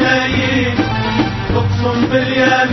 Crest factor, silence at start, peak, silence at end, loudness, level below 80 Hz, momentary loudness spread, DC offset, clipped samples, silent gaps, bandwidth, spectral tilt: 14 dB; 0 s; 0 dBFS; 0 s; -15 LUFS; -32 dBFS; 4 LU; under 0.1%; under 0.1%; none; 6.2 kHz; -6 dB/octave